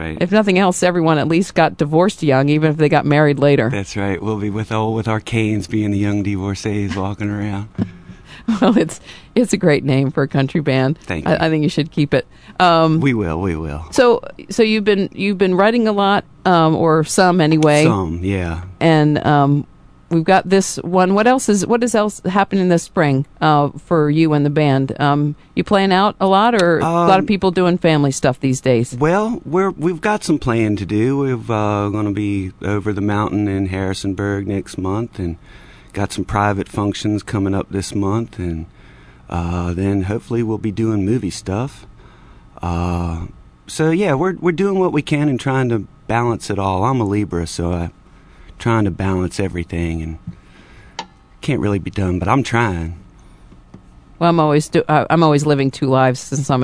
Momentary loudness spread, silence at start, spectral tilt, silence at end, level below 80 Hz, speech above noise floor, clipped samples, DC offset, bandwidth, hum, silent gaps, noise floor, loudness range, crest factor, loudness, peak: 10 LU; 0 s; -6 dB/octave; 0 s; -40 dBFS; 27 dB; under 0.1%; under 0.1%; 11 kHz; none; none; -43 dBFS; 7 LU; 16 dB; -17 LUFS; 0 dBFS